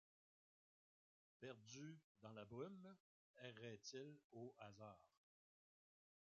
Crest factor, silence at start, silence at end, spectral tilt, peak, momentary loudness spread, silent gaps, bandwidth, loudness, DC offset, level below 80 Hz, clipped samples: 22 dB; 1.4 s; 1.3 s; -4.5 dB/octave; -40 dBFS; 7 LU; 2.04-2.15 s, 3.00-3.34 s, 4.24-4.30 s; 7.2 kHz; -60 LUFS; under 0.1%; under -90 dBFS; under 0.1%